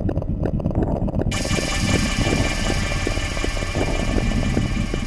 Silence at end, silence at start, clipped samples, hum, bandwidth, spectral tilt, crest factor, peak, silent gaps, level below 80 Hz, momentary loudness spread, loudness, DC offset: 0 s; 0 s; under 0.1%; none; 13 kHz; -5 dB/octave; 16 dB; -6 dBFS; none; -26 dBFS; 4 LU; -22 LUFS; under 0.1%